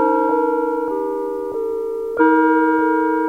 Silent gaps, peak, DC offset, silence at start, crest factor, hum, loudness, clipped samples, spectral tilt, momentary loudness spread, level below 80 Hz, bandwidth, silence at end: none; -2 dBFS; 0.2%; 0 s; 14 dB; none; -18 LUFS; under 0.1%; -6.5 dB/octave; 9 LU; -56 dBFS; 4.2 kHz; 0 s